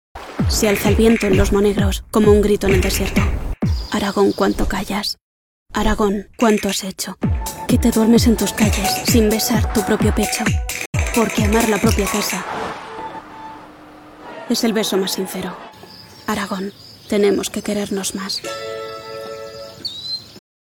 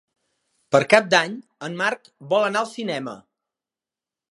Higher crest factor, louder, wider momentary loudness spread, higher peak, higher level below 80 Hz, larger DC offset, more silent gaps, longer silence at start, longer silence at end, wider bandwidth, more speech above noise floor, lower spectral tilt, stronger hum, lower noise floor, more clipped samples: about the same, 18 dB vs 22 dB; first, -18 LUFS vs -21 LUFS; about the same, 16 LU vs 18 LU; about the same, -2 dBFS vs 0 dBFS; first, -28 dBFS vs -70 dBFS; neither; first, 5.21-5.66 s, 10.86-10.93 s vs none; second, 0.15 s vs 0.7 s; second, 0.25 s vs 1.1 s; first, 18 kHz vs 11.5 kHz; second, 24 dB vs over 69 dB; about the same, -4.5 dB/octave vs -4 dB/octave; neither; second, -41 dBFS vs under -90 dBFS; neither